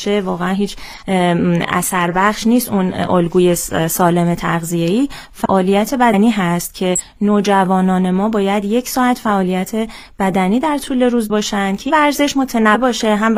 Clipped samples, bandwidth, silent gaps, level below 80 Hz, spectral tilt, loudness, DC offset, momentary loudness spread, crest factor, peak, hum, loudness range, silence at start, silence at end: under 0.1%; 16 kHz; none; -42 dBFS; -5 dB/octave; -15 LUFS; under 0.1%; 5 LU; 14 dB; 0 dBFS; none; 2 LU; 0 s; 0 s